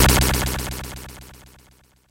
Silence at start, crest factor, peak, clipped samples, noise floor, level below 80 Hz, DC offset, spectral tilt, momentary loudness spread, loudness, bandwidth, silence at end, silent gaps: 0 s; 18 dB; -4 dBFS; under 0.1%; -55 dBFS; -28 dBFS; under 0.1%; -3.5 dB/octave; 24 LU; -21 LUFS; 17 kHz; 0.8 s; none